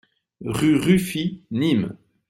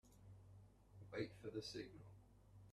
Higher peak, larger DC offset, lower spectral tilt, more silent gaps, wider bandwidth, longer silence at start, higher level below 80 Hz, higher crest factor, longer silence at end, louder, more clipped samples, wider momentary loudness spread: first, -6 dBFS vs -32 dBFS; neither; about the same, -6 dB/octave vs -5.5 dB/octave; neither; first, 16 kHz vs 13.5 kHz; first, 0.4 s vs 0.05 s; first, -52 dBFS vs -74 dBFS; second, 16 dB vs 22 dB; first, 0.35 s vs 0 s; first, -22 LUFS vs -52 LUFS; neither; second, 12 LU vs 18 LU